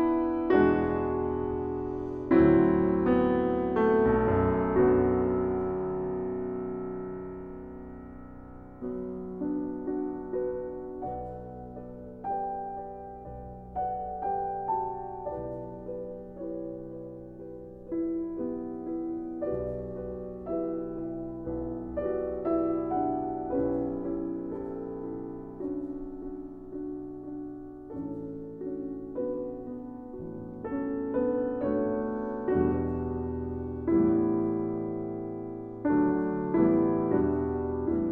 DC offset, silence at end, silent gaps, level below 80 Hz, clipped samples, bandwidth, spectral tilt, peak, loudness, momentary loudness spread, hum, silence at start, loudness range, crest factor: under 0.1%; 0 s; none; -50 dBFS; under 0.1%; 4.1 kHz; -11 dB/octave; -10 dBFS; -30 LUFS; 16 LU; none; 0 s; 12 LU; 20 dB